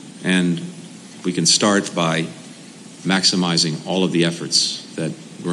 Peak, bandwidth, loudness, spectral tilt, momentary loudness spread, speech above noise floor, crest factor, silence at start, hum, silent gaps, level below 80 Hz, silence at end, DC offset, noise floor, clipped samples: -4 dBFS; 12.5 kHz; -18 LUFS; -3.5 dB/octave; 22 LU; 21 dB; 18 dB; 0 s; none; none; -70 dBFS; 0 s; under 0.1%; -40 dBFS; under 0.1%